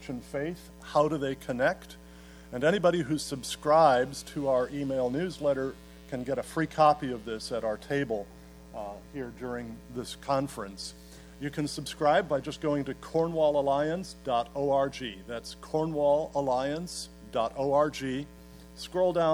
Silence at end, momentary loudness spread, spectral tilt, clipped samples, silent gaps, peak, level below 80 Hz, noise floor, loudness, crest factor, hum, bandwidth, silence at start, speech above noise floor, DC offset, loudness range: 0 s; 15 LU; -5.5 dB/octave; under 0.1%; none; -10 dBFS; -54 dBFS; -49 dBFS; -29 LUFS; 20 dB; none; 19.5 kHz; 0 s; 20 dB; under 0.1%; 8 LU